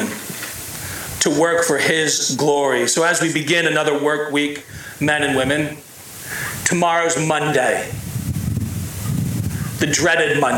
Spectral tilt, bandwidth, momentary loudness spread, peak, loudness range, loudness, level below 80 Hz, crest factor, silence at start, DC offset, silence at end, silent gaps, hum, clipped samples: -3.5 dB/octave; 18 kHz; 11 LU; -4 dBFS; 4 LU; -18 LUFS; -44 dBFS; 16 dB; 0 s; under 0.1%; 0 s; none; none; under 0.1%